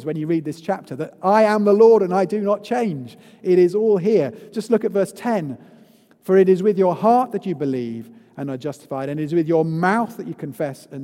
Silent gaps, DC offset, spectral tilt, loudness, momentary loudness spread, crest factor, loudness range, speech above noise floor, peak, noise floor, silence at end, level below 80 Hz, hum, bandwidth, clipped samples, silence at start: none; under 0.1%; -7.5 dB/octave; -19 LUFS; 15 LU; 18 dB; 6 LU; 32 dB; -2 dBFS; -51 dBFS; 0 s; -70 dBFS; none; 15 kHz; under 0.1%; 0 s